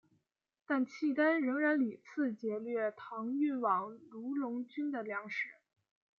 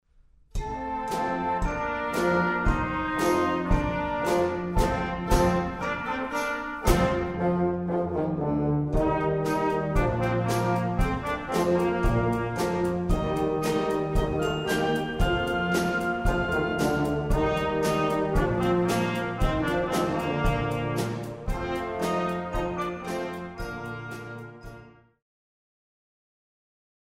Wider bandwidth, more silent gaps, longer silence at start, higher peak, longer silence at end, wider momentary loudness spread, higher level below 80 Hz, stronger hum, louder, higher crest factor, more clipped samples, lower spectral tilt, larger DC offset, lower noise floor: second, 6.8 kHz vs 16 kHz; neither; first, 0.7 s vs 0.55 s; second, -18 dBFS vs -8 dBFS; second, 0.65 s vs 2.15 s; about the same, 9 LU vs 8 LU; second, under -90 dBFS vs -34 dBFS; neither; second, -35 LUFS vs -27 LUFS; about the same, 18 dB vs 20 dB; neither; about the same, -6.5 dB/octave vs -6 dB/octave; neither; first, -78 dBFS vs -58 dBFS